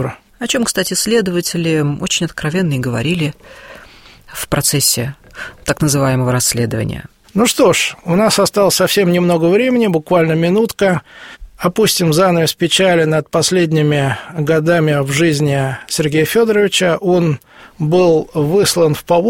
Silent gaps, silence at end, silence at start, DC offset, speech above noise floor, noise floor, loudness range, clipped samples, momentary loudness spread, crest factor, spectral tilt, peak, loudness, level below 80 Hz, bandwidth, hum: none; 0 s; 0 s; under 0.1%; 27 dB; -40 dBFS; 4 LU; under 0.1%; 8 LU; 14 dB; -4.5 dB/octave; 0 dBFS; -14 LUFS; -44 dBFS; 16.5 kHz; none